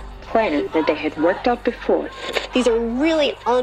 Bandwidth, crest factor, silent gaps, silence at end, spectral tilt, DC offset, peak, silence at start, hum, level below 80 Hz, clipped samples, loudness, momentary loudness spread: 12 kHz; 16 dB; none; 0 s; -4.5 dB/octave; under 0.1%; -4 dBFS; 0 s; none; -42 dBFS; under 0.1%; -20 LUFS; 4 LU